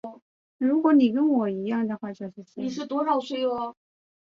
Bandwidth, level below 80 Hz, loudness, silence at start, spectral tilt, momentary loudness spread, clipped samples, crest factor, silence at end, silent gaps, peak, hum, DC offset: 7.4 kHz; -72 dBFS; -25 LUFS; 0.05 s; -7 dB/octave; 16 LU; under 0.1%; 18 dB; 0.5 s; 0.22-0.59 s; -8 dBFS; none; under 0.1%